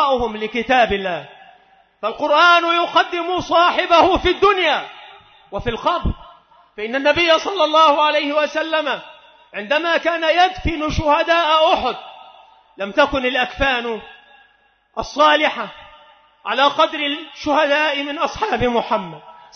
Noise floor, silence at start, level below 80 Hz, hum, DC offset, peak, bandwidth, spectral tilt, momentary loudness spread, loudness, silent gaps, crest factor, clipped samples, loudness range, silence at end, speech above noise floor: -58 dBFS; 0 s; -38 dBFS; none; under 0.1%; -2 dBFS; 6.6 kHz; -4 dB/octave; 14 LU; -17 LUFS; none; 16 dB; under 0.1%; 4 LU; 0.25 s; 41 dB